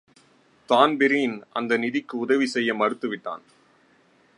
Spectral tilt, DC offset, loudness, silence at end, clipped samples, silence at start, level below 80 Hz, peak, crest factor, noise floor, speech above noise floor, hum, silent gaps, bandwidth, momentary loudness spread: -4.5 dB/octave; under 0.1%; -23 LUFS; 1 s; under 0.1%; 0.7 s; -76 dBFS; -4 dBFS; 22 dB; -60 dBFS; 37 dB; none; none; 11.5 kHz; 12 LU